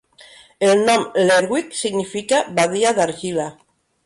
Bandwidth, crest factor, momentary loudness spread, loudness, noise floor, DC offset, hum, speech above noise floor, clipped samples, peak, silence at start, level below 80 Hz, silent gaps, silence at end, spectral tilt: 11.5 kHz; 14 dB; 9 LU; -18 LUFS; -46 dBFS; under 0.1%; none; 29 dB; under 0.1%; -6 dBFS; 0.6 s; -62 dBFS; none; 0.55 s; -3.5 dB/octave